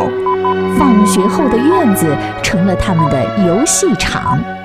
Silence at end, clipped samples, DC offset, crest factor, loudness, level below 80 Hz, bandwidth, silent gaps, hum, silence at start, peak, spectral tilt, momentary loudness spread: 0 s; under 0.1%; 0.6%; 12 dB; -12 LUFS; -32 dBFS; 16 kHz; none; none; 0 s; 0 dBFS; -5 dB/octave; 5 LU